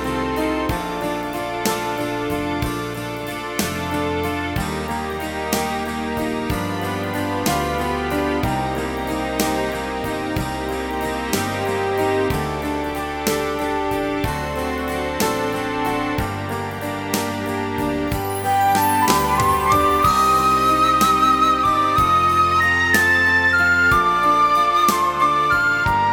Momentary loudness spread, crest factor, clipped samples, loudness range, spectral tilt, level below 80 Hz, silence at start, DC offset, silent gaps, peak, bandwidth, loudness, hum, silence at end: 10 LU; 20 dB; under 0.1%; 8 LU; -4.5 dB/octave; -38 dBFS; 0 s; under 0.1%; none; 0 dBFS; over 20 kHz; -19 LUFS; none; 0 s